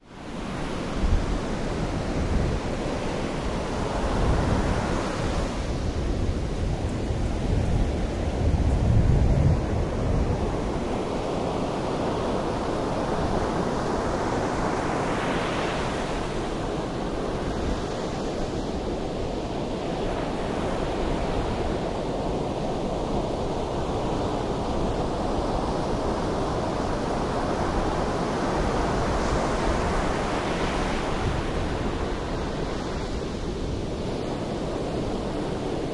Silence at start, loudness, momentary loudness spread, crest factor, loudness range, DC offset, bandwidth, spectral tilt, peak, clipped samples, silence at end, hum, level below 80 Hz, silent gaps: 0.05 s; -27 LUFS; 5 LU; 18 dB; 5 LU; under 0.1%; 11.5 kHz; -6.5 dB/octave; -8 dBFS; under 0.1%; 0 s; none; -32 dBFS; none